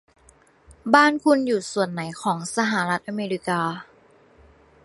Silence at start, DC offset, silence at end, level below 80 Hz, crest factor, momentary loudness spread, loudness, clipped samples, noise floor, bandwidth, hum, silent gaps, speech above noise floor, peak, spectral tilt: 0.7 s; under 0.1%; 1 s; -62 dBFS; 24 dB; 11 LU; -22 LUFS; under 0.1%; -56 dBFS; 11.5 kHz; none; none; 34 dB; 0 dBFS; -4.5 dB/octave